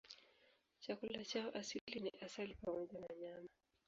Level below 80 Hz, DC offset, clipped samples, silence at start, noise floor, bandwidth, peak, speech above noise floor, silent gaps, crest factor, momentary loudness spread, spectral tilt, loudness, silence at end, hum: -76 dBFS; under 0.1%; under 0.1%; 0.05 s; -76 dBFS; 7.4 kHz; -28 dBFS; 28 dB; 1.81-1.87 s; 20 dB; 13 LU; -3 dB/octave; -48 LUFS; 0.4 s; none